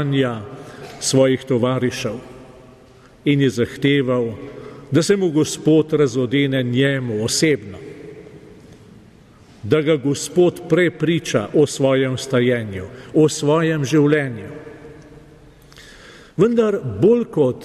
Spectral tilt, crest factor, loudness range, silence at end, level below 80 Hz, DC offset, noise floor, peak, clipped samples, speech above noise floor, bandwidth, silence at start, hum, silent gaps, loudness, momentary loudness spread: -5.5 dB/octave; 16 dB; 4 LU; 0 s; -54 dBFS; under 0.1%; -47 dBFS; -4 dBFS; under 0.1%; 29 dB; 13.5 kHz; 0 s; none; none; -18 LUFS; 18 LU